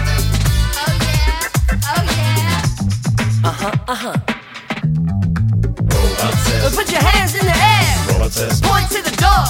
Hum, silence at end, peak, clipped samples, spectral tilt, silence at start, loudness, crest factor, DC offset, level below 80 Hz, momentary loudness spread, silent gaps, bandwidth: none; 0 s; 0 dBFS; under 0.1%; -4.5 dB/octave; 0 s; -16 LUFS; 14 dB; under 0.1%; -22 dBFS; 7 LU; none; 17 kHz